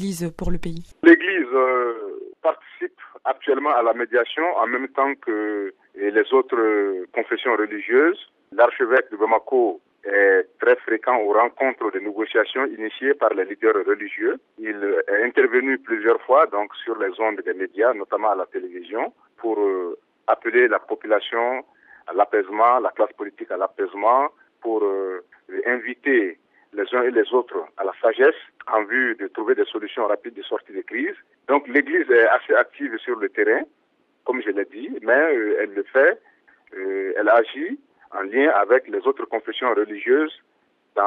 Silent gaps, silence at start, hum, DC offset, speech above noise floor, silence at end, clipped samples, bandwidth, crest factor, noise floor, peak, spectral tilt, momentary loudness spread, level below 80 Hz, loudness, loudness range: none; 0 s; none; under 0.1%; 45 dB; 0 s; under 0.1%; 10 kHz; 22 dB; -65 dBFS; 0 dBFS; -5.5 dB/octave; 13 LU; -48 dBFS; -21 LUFS; 3 LU